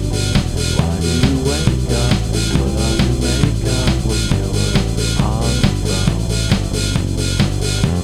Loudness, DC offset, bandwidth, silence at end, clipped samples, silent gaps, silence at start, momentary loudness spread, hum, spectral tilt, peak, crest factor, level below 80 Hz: -17 LUFS; under 0.1%; 15.5 kHz; 0 s; under 0.1%; none; 0 s; 2 LU; none; -5 dB/octave; 0 dBFS; 16 dB; -22 dBFS